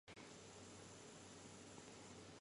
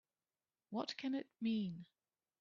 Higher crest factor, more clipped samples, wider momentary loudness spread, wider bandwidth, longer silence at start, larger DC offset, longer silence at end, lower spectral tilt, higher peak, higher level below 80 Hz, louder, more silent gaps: about the same, 16 dB vs 18 dB; neither; second, 0 LU vs 7 LU; first, 11.5 kHz vs 7.2 kHz; second, 0.05 s vs 0.7 s; neither; second, 0 s vs 0.55 s; second, -3.5 dB/octave vs -5 dB/octave; second, -44 dBFS vs -28 dBFS; first, -78 dBFS vs -88 dBFS; second, -59 LUFS vs -43 LUFS; neither